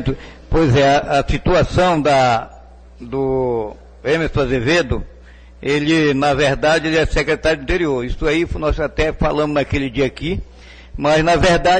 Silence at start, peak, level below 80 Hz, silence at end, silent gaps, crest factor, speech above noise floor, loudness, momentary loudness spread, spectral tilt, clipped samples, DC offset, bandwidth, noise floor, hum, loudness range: 0 s; -6 dBFS; -30 dBFS; 0 s; none; 12 dB; 25 dB; -17 LUFS; 11 LU; -5.5 dB/octave; under 0.1%; under 0.1%; 9.4 kHz; -41 dBFS; none; 3 LU